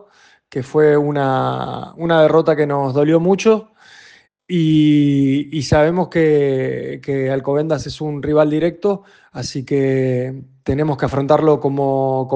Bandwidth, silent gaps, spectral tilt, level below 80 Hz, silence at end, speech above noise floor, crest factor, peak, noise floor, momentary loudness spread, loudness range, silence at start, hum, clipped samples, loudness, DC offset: 9 kHz; none; -7 dB/octave; -46 dBFS; 0 s; 31 dB; 14 dB; -2 dBFS; -47 dBFS; 11 LU; 4 LU; 0.55 s; none; under 0.1%; -16 LUFS; under 0.1%